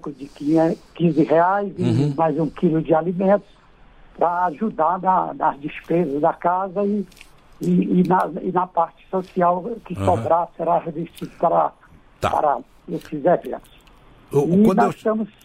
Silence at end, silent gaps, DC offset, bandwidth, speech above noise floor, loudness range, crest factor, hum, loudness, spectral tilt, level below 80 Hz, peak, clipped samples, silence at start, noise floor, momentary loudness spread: 0.15 s; none; under 0.1%; 14 kHz; 29 dB; 3 LU; 16 dB; none; -20 LUFS; -8.5 dB/octave; -52 dBFS; -6 dBFS; under 0.1%; 0.05 s; -49 dBFS; 11 LU